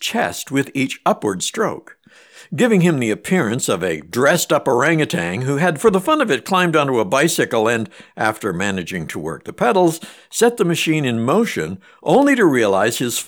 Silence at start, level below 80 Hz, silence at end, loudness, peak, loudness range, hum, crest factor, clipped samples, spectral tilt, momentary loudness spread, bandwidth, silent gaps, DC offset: 0 s; -58 dBFS; 0 s; -17 LUFS; -2 dBFS; 3 LU; none; 14 dB; under 0.1%; -4.5 dB/octave; 10 LU; over 20 kHz; none; under 0.1%